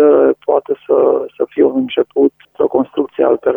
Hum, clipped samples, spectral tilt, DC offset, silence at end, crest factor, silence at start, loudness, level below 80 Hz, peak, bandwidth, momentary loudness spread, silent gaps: none; under 0.1%; -8.5 dB/octave; under 0.1%; 0 s; 12 dB; 0 s; -15 LUFS; -58 dBFS; 0 dBFS; 3.7 kHz; 5 LU; none